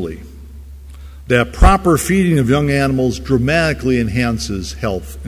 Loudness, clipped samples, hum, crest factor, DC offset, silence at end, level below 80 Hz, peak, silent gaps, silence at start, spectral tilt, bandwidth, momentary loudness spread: -15 LUFS; under 0.1%; none; 16 dB; under 0.1%; 0 s; -22 dBFS; 0 dBFS; none; 0 s; -6 dB/octave; 16 kHz; 14 LU